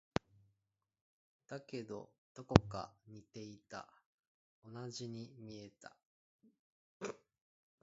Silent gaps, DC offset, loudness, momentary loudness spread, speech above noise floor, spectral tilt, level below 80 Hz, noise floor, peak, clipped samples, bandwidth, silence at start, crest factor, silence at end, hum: 2.18-2.35 s, 4.06-4.62 s, 6.05-6.39 s, 6.59-7.00 s; under 0.1%; -41 LUFS; 25 LU; 47 dB; -6 dB/octave; -58 dBFS; -88 dBFS; -4 dBFS; under 0.1%; 7.6 kHz; 1.5 s; 40 dB; 0.65 s; none